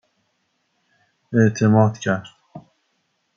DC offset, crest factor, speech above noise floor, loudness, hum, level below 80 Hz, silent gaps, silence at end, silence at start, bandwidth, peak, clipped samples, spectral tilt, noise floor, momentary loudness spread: under 0.1%; 18 dB; 53 dB; -19 LUFS; none; -64 dBFS; none; 0.75 s; 1.3 s; 7.4 kHz; -4 dBFS; under 0.1%; -7 dB/octave; -70 dBFS; 10 LU